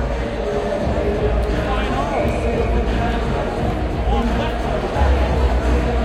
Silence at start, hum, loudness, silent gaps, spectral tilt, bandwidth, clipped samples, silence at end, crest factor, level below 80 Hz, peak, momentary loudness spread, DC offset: 0 s; none; -20 LUFS; none; -7 dB/octave; 10 kHz; under 0.1%; 0 s; 14 dB; -22 dBFS; -6 dBFS; 4 LU; under 0.1%